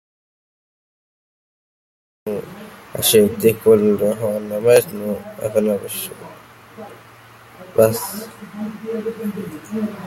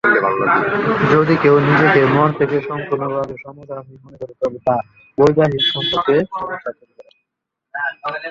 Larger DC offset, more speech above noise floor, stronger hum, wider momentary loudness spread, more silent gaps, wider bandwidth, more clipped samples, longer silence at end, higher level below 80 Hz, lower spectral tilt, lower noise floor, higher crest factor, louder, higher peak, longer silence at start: neither; second, 26 dB vs 63 dB; neither; first, 23 LU vs 19 LU; neither; first, 16.5 kHz vs 7.4 kHz; neither; about the same, 0 s vs 0 s; second, -58 dBFS vs -52 dBFS; second, -4.5 dB/octave vs -7 dB/octave; second, -44 dBFS vs -79 dBFS; about the same, 20 dB vs 16 dB; about the same, -18 LUFS vs -16 LUFS; about the same, 0 dBFS vs 0 dBFS; first, 2.25 s vs 0.05 s